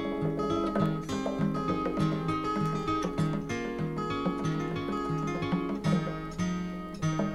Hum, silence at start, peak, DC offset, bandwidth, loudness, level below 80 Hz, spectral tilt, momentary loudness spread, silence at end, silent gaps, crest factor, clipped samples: none; 0 s; -16 dBFS; under 0.1%; 12 kHz; -31 LUFS; -50 dBFS; -7 dB/octave; 4 LU; 0 s; none; 16 dB; under 0.1%